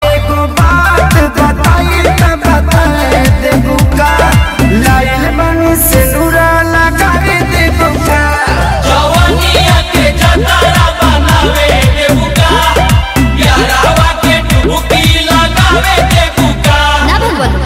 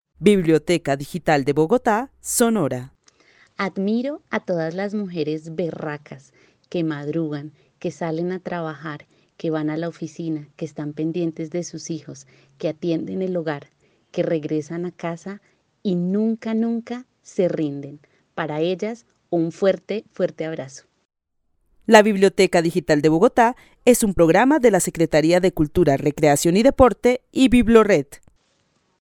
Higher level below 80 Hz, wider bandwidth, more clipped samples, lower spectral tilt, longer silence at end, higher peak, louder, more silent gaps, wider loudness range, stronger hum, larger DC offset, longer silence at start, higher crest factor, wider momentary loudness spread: first, -14 dBFS vs -44 dBFS; about the same, 16.5 kHz vs 17.5 kHz; first, 0.4% vs under 0.1%; about the same, -4.5 dB/octave vs -5.5 dB/octave; second, 0 s vs 0.85 s; about the same, 0 dBFS vs 0 dBFS; first, -8 LUFS vs -20 LUFS; second, none vs 21.05-21.09 s; second, 1 LU vs 11 LU; neither; neither; second, 0 s vs 0.2 s; second, 8 dB vs 20 dB; second, 3 LU vs 16 LU